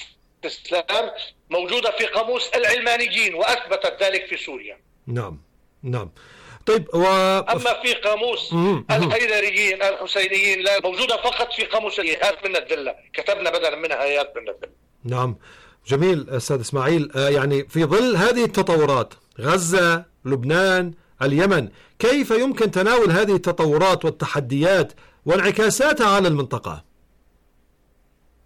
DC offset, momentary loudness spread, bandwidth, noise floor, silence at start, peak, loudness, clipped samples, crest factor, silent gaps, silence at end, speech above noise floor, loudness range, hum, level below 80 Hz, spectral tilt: under 0.1%; 12 LU; 16.5 kHz; -60 dBFS; 0 s; -10 dBFS; -20 LUFS; under 0.1%; 10 dB; none; 1.65 s; 40 dB; 5 LU; none; -52 dBFS; -4.5 dB/octave